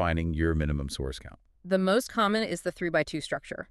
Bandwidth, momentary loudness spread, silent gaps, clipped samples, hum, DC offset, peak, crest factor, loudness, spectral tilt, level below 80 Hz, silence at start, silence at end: 13.5 kHz; 10 LU; none; under 0.1%; none; under 0.1%; -12 dBFS; 18 dB; -29 LUFS; -5.5 dB/octave; -40 dBFS; 0 s; 0.05 s